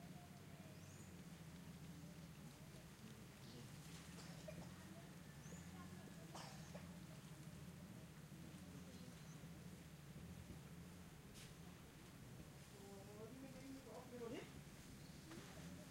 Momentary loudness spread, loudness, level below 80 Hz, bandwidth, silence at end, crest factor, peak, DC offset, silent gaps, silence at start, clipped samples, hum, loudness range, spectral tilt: 4 LU; -58 LUFS; -72 dBFS; 16.5 kHz; 0 s; 18 dB; -40 dBFS; under 0.1%; none; 0 s; under 0.1%; none; 2 LU; -5 dB/octave